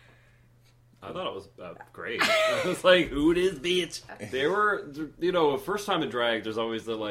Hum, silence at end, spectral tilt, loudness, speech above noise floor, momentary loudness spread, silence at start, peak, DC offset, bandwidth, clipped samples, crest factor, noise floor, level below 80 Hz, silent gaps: none; 0 s; -4 dB/octave; -26 LUFS; 32 dB; 18 LU; 1 s; -6 dBFS; under 0.1%; 16 kHz; under 0.1%; 20 dB; -59 dBFS; -54 dBFS; none